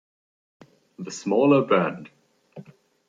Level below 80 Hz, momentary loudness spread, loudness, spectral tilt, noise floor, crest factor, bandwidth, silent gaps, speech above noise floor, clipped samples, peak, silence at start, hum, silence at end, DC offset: -74 dBFS; 21 LU; -21 LUFS; -6 dB/octave; -47 dBFS; 20 dB; 7.8 kHz; none; 26 dB; under 0.1%; -6 dBFS; 1 s; none; 0.45 s; under 0.1%